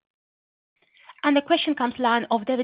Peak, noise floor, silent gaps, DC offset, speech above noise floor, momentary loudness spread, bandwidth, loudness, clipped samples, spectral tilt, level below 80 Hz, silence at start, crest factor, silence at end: -6 dBFS; under -90 dBFS; none; under 0.1%; over 68 dB; 4 LU; 5.2 kHz; -23 LUFS; under 0.1%; -8.5 dB/octave; -70 dBFS; 1.1 s; 18 dB; 0 s